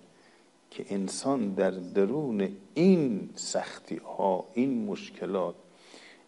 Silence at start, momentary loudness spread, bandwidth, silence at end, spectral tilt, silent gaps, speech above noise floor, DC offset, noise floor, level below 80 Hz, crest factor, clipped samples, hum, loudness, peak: 0.7 s; 12 LU; 11.5 kHz; 0.15 s; -6 dB/octave; none; 32 dB; under 0.1%; -60 dBFS; -76 dBFS; 18 dB; under 0.1%; none; -30 LUFS; -12 dBFS